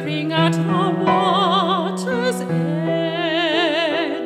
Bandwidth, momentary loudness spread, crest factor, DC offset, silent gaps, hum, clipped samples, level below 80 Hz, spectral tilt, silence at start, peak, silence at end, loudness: 14 kHz; 5 LU; 16 dB; under 0.1%; none; none; under 0.1%; -64 dBFS; -5.5 dB/octave; 0 s; -4 dBFS; 0 s; -19 LUFS